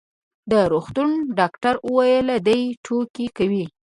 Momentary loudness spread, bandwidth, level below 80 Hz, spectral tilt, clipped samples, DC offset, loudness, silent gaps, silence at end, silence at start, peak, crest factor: 7 LU; 11.5 kHz; -54 dBFS; -6.5 dB/octave; under 0.1%; under 0.1%; -20 LUFS; 2.77-2.84 s, 3.10-3.14 s; 0.2 s; 0.45 s; -2 dBFS; 18 dB